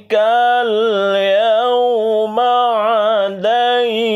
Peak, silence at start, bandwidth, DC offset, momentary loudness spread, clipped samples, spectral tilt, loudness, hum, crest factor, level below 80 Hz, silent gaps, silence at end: -4 dBFS; 0.1 s; 12 kHz; under 0.1%; 3 LU; under 0.1%; -4.5 dB/octave; -14 LUFS; none; 10 dB; -70 dBFS; none; 0 s